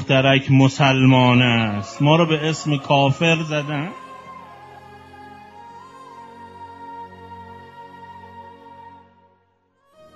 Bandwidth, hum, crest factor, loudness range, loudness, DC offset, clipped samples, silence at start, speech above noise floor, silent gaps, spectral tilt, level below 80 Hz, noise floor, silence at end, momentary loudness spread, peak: 7.8 kHz; none; 20 dB; 24 LU; -17 LUFS; under 0.1%; under 0.1%; 0 s; 46 dB; none; -6 dB/octave; -56 dBFS; -63 dBFS; 1.25 s; 26 LU; 0 dBFS